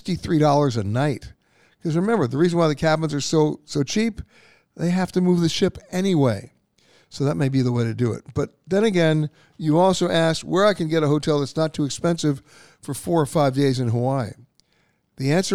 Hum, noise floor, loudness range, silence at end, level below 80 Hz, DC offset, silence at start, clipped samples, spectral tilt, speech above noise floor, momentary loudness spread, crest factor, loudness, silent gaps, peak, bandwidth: none; -65 dBFS; 3 LU; 0 s; -52 dBFS; 0.4%; 0.05 s; under 0.1%; -6 dB/octave; 45 dB; 10 LU; 16 dB; -21 LUFS; none; -6 dBFS; 15 kHz